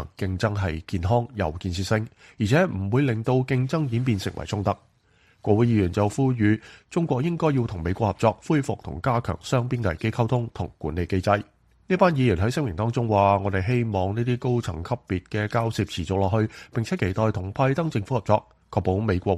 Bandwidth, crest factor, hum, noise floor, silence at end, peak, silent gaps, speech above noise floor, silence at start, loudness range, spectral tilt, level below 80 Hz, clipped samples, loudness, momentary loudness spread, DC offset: 12.5 kHz; 20 dB; none; -61 dBFS; 0 s; -4 dBFS; none; 37 dB; 0 s; 3 LU; -7 dB/octave; -46 dBFS; under 0.1%; -25 LUFS; 8 LU; under 0.1%